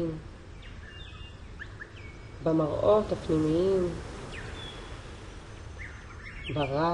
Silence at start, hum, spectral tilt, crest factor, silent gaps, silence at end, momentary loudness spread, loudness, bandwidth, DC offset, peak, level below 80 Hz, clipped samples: 0 s; none; -7 dB/octave; 18 dB; none; 0 s; 20 LU; -29 LUFS; 11 kHz; under 0.1%; -12 dBFS; -46 dBFS; under 0.1%